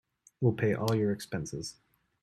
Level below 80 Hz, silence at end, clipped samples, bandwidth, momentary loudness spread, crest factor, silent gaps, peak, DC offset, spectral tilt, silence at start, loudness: -62 dBFS; 0.5 s; under 0.1%; 14 kHz; 11 LU; 18 dB; none; -14 dBFS; under 0.1%; -6.5 dB/octave; 0.4 s; -31 LUFS